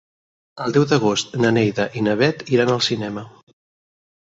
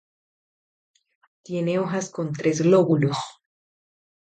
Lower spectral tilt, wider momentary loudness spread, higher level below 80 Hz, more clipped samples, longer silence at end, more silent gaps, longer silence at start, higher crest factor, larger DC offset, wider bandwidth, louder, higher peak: second, -5 dB/octave vs -6.5 dB/octave; second, 9 LU vs 13 LU; first, -58 dBFS vs -68 dBFS; neither; about the same, 1.05 s vs 1 s; neither; second, 0.55 s vs 1.5 s; about the same, 18 dB vs 18 dB; neither; second, 8.2 kHz vs 9.2 kHz; first, -19 LUFS vs -23 LUFS; first, -2 dBFS vs -6 dBFS